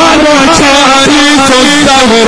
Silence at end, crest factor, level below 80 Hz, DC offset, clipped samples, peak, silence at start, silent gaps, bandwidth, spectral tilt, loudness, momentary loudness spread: 0 s; 4 dB; -28 dBFS; under 0.1%; 6%; 0 dBFS; 0 s; none; 11 kHz; -2.5 dB/octave; -3 LUFS; 1 LU